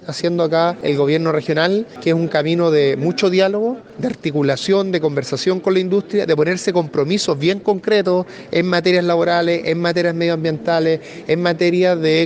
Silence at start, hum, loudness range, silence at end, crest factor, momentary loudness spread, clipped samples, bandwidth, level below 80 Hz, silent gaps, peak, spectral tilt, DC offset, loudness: 0 s; none; 1 LU; 0 s; 14 dB; 5 LU; under 0.1%; 9.6 kHz; -60 dBFS; none; -2 dBFS; -6 dB/octave; under 0.1%; -17 LUFS